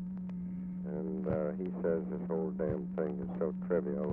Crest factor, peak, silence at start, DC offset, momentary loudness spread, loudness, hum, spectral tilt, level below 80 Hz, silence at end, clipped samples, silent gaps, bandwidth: 16 dB; -18 dBFS; 0 s; under 0.1%; 7 LU; -36 LUFS; none; -12.5 dB/octave; -58 dBFS; 0 s; under 0.1%; none; 3 kHz